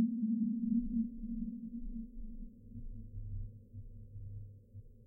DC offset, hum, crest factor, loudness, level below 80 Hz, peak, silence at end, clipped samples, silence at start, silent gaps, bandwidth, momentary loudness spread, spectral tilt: under 0.1%; none; 18 dB; -40 LUFS; -48 dBFS; -22 dBFS; 0.05 s; under 0.1%; 0 s; none; 0.6 kHz; 19 LU; -13.5 dB/octave